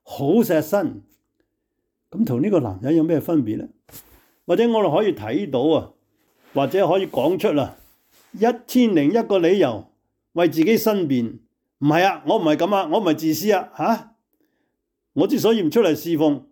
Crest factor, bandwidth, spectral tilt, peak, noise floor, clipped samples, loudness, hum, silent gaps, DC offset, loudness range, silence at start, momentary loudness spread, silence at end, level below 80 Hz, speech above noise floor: 14 dB; 19 kHz; -6 dB/octave; -6 dBFS; -76 dBFS; under 0.1%; -20 LUFS; none; none; under 0.1%; 3 LU; 0.1 s; 8 LU; 0.1 s; -64 dBFS; 57 dB